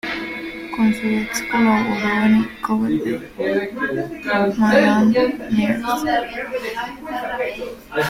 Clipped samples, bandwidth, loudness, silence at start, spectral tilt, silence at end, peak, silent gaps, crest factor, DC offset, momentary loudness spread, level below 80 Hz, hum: under 0.1%; 16 kHz; -20 LUFS; 0.05 s; -5.5 dB/octave; 0 s; -2 dBFS; none; 16 dB; under 0.1%; 11 LU; -48 dBFS; none